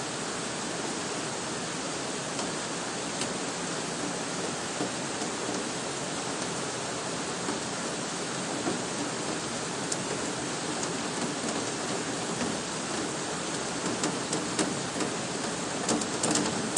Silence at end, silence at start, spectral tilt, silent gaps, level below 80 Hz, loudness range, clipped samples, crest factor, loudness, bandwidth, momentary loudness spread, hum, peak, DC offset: 0 s; 0 s; -2.5 dB/octave; none; -64 dBFS; 2 LU; under 0.1%; 24 dB; -31 LUFS; 11.5 kHz; 3 LU; none; -8 dBFS; under 0.1%